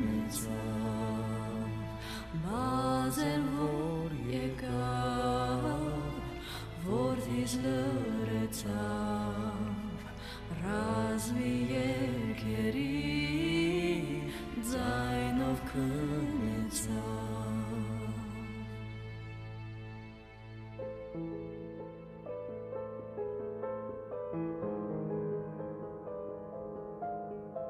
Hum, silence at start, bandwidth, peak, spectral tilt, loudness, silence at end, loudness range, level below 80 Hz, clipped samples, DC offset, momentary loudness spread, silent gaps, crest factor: none; 0 s; 14.5 kHz; -18 dBFS; -6 dB/octave; -36 LUFS; 0 s; 10 LU; -50 dBFS; under 0.1%; under 0.1%; 11 LU; none; 16 dB